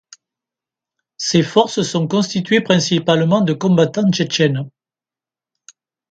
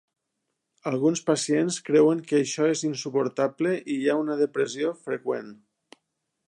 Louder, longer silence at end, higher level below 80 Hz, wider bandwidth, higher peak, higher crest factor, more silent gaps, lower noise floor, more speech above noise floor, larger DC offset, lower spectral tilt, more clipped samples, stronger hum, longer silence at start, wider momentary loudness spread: first, -16 LUFS vs -25 LUFS; first, 1.45 s vs 0.95 s; first, -58 dBFS vs -78 dBFS; second, 9.2 kHz vs 11.5 kHz; first, 0 dBFS vs -8 dBFS; about the same, 18 dB vs 18 dB; neither; first, under -90 dBFS vs -80 dBFS; first, over 75 dB vs 56 dB; neither; about the same, -5 dB/octave vs -5 dB/octave; neither; neither; first, 1.2 s vs 0.85 s; second, 4 LU vs 10 LU